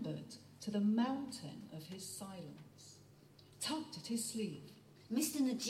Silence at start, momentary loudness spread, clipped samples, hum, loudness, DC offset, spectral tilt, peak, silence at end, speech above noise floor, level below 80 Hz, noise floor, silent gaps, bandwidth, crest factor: 0 s; 22 LU; under 0.1%; none; -41 LUFS; under 0.1%; -4 dB/octave; -24 dBFS; 0 s; 23 dB; -80 dBFS; -63 dBFS; none; 16.5 kHz; 18 dB